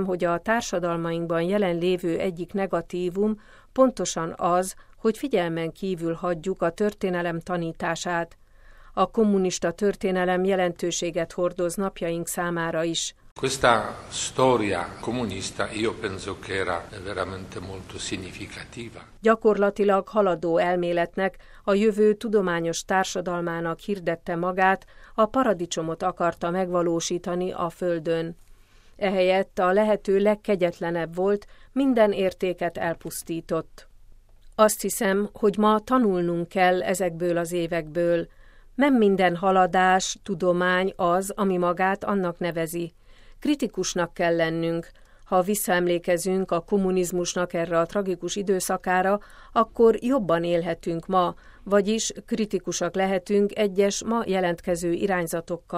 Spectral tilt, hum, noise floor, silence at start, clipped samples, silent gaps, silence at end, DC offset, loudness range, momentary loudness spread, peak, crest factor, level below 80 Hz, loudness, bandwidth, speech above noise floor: -5 dB/octave; none; -51 dBFS; 0 s; under 0.1%; 13.31-13.36 s; 0 s; under 0.1%; 4 LU; 9 LU; -2 dBFS; 22 dB; -50 dBFS; -25 LUFS; 16 kHz; 27 dB